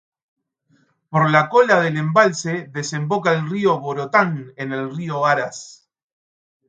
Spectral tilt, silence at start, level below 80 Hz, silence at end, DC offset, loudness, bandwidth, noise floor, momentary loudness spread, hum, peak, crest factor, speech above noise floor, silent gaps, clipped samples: -5.5 dB/octave; 1.1 s; -68 dBFS; 0.95 s; under 0.1%; -19 LUFS; 9.2 kHz; -62 dBFS; 12 LU; none; 0 dBFS; 20 dB; 43 dB; none; under 0.1%